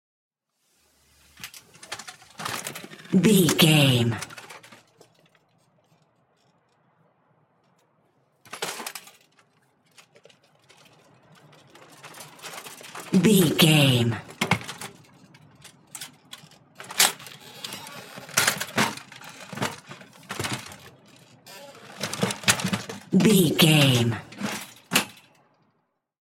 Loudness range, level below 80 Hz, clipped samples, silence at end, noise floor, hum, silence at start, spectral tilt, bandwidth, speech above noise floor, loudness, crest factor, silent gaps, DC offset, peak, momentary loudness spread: 18 LU; -66 dBFS; under 0.1%; 1.2 s; -73 dBFS; none; 1.45 s; -4 dB/octave; 16.5 kHz; 54 dB; -22 LUFS; 24 dB; none; under 0.1%; -2 dBFS; 25 LU